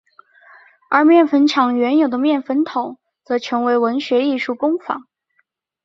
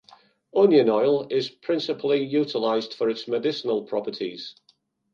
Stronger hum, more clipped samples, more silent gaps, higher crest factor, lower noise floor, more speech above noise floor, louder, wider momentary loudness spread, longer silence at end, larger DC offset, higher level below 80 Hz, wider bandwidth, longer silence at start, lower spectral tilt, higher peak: neither; neither; neither; about the same, 16 dB vs 18 dB; about the same, -66 dBFS vs -65 dBFS; first, 50 dB vs 42 dB; first, -17 LUFS vs -24 LUFS; about the same, 11 LU vs 13 LU; first, 0.85 s vs 0.6 s; neither; first, -68 dBFS vs -76 dBFS; about the same, 7.6 kHz vs 7.2 kHz; first, 0.9 s vs 0.55 s; second, -4.5 dB/octave vs -6.5 dB/octave; first, -2 dBFS vs -6 dBFS